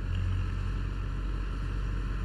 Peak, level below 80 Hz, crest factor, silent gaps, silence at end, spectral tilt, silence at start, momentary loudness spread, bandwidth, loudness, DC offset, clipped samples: -22 dBFS; -34 dBFS; 10 dB; none; 0 s; -7 dB/octave; 0 s; 3 LU; 7.6 kHz; -35 LUFS; under 0.1%; under 0.1%